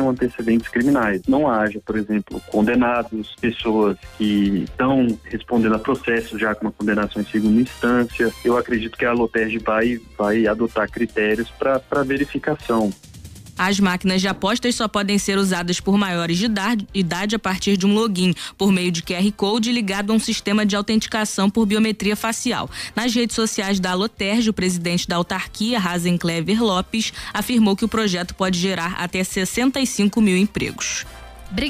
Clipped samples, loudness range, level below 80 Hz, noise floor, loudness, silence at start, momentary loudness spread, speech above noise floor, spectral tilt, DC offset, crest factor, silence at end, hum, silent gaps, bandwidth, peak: under 0.1%; 1 LU; -44 dBFS; -39 dBFS; -20 LUFS; 0 s; 5 LU; 19 dB; -4.5 dB/octave; under 0.1%; 12 dB; 0 s; none; none; 15.5 kHz; -8 dBFS